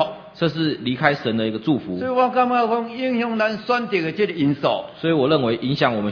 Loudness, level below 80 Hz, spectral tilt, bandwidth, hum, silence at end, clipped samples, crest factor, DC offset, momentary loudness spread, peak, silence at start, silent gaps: -21 LUFS; -60 dBFS; -7.5 dB/octave; 5.4 kHz; none; 0 s; under 0.1%; 20 dB; under 0.1%; 5 LU; 0 dBFS; 0 s; none